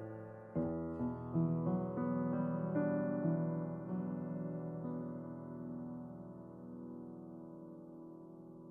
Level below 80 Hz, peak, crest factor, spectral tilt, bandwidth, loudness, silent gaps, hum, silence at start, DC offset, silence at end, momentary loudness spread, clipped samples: -68 dBFS; -24 dBFS; 16 dB; -12.5 dB/octave; 2.7 kHz; -40 LUFS; none; none; 0 s; under 0.1%; 0 s; 16 LU; under 0.1%